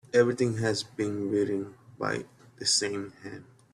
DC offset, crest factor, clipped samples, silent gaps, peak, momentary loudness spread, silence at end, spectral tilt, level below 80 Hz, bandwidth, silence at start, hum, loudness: under 0.1%; 18 dB; under 0.1%; none; -10 dBFS; 19 LU; 0.3 s; -4 dB/octave; -66 dBFS; 12.5 kHz; 0.15 s; none; -29 LUFS